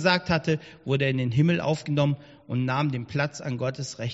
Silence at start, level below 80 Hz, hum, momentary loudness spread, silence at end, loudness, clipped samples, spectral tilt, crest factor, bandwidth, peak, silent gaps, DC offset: 0 s; -56 dBFS; none; 8 LU; 0 s; -26 LUFS; under 0.1%; -5.5 dB/octave; 18 dB; 8 kHz; -6 dBFS; none; under 0.1%